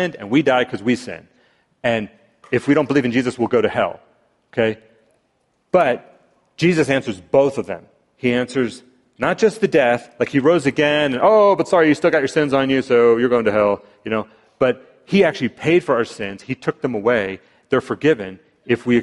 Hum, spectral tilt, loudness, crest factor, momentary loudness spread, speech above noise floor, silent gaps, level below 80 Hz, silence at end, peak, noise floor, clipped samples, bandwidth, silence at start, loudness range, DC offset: none; -6 dB/octave; -18 LUFS; 16 dB; 11 LU; 48 dB; none; -56 dBFS; 0 s; -2 dBFS; -66 dBFS; under 0.1%; 11.5 kHz; 0 s; 5 LU; under 0.1%